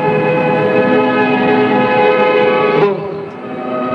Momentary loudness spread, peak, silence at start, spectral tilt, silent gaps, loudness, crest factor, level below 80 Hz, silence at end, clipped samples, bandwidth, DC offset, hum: 11 LU; -2 dBFS; 0 s; -8 dB/octave; none; -12 LUFS; 12 dB; -56 dBFS; 0 s; under 0.1%; 6 kHz; under 0.1%; none